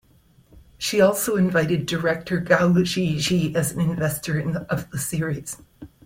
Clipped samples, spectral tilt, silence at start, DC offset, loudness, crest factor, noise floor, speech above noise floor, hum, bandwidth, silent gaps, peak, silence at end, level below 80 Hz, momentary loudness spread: under 0.1%; -5 dB/octave; 0.55 s; under 0.1%; -22 LUFS; 18 dB; -56 dBFS; 35 dB; none; 16.5 kHz; none; -4 dBFS; 0.2 s; -52 dBFS; 9 LU